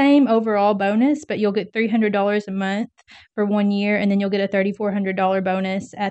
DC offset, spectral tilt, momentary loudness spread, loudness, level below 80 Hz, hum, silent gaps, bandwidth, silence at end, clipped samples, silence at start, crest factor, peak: under 0.1%; -7 dB/octave; 7 LU; -20 LUFS; -66 dBFS; none; none; 8.4 kHz; 0 s; under 0.1%; 0 s; 14 dB; -6 dBFS